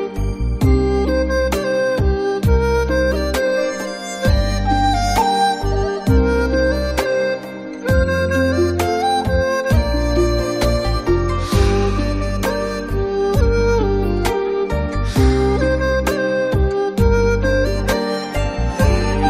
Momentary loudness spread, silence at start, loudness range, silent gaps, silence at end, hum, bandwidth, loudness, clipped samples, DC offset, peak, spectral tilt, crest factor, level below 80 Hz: 5 LU; 0 s; 1 LU; none; 0 s; none; 16 kHz; -18 LUFS; under 0.1%; under 0.1%; -2 dBFS; -6 dB/octave; 14 dB; -22 dBFS